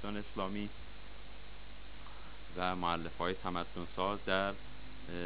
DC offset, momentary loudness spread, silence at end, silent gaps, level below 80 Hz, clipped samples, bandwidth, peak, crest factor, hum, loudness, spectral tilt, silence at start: 0.8%; 18 LU; 0 s; none; -54 dBFS; under 0.1%; 5.2 kHz; -16 dBFS; 24 dB; 50 Hz at -55 dBFS; -38 LUFS; -3 dB/octave; 0 s